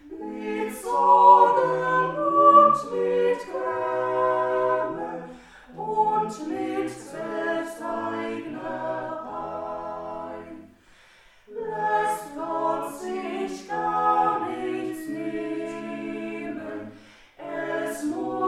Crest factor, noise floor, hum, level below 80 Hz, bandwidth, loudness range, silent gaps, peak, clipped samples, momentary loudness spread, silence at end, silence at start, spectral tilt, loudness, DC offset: 22 dB; -55 dBFS; none; -62 dBFS; 14.5 kHz; 14 LU; none; -4 dBFS; under 0.1%; 18 LU; 0 s; 0.05 s; -5.5 dB/octave; -24 LUFS; under 0.1%